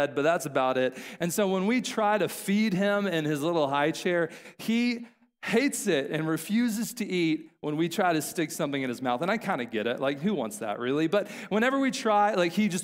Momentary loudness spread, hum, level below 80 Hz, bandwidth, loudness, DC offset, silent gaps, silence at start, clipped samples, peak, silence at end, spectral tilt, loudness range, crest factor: 6 LU; none; -74 dBFS; 16 kHz; -27 LUFS; under 0.1%; none; 0 s; under 0.1%; -12 dBFS; 0 s; -5 dB/octave; 2 LU; 16 dB